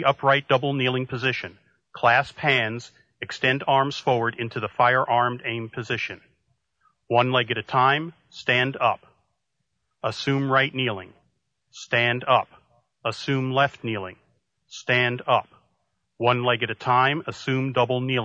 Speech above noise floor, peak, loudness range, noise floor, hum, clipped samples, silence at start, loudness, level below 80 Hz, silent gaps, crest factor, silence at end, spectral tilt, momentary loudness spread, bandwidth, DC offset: 55 dB; -4 dBFS; 3 LU; -78 dBFS; none; under 0.1%; 0 s; -23 LUFS; -66 dBFS; none; 20 dB; 0 s; -5.5 dB/octave; 12 LU; 8.6 kHz; under 0.1%